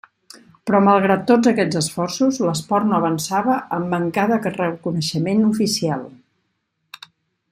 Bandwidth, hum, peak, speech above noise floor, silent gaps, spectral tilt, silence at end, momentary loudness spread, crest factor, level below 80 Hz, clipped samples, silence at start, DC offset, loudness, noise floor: 15.5 kHz; none; -2 dBFS; 54 dB; none; -5.5 dB/octave; 1.4 s; 8 LU; 16 dB; -60 dBFS; under 0.1%; 0.35 s; under 0.1%; -19 LUFS; -72 dBFS